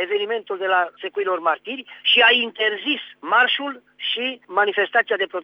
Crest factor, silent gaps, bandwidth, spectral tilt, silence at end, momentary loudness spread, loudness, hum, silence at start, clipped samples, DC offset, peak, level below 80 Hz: 18 dB; none; 6 kHz; -4 dB/octave; 0 s; 12 LU; -20 LUFS; none; 0 s; under 0.1%; under 0.1%; -4 dBFS; -82 dBFS